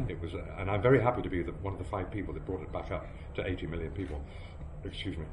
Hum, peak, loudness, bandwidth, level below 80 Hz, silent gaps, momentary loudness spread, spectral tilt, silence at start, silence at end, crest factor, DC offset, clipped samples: none; -12 dBFS; -34 LUFS; 10.5 kHz; -44 dBFS; none; 16 LU; -8 dB/octave; 0 s; 0 s; 20 dB; under 0.1%; under 0.1%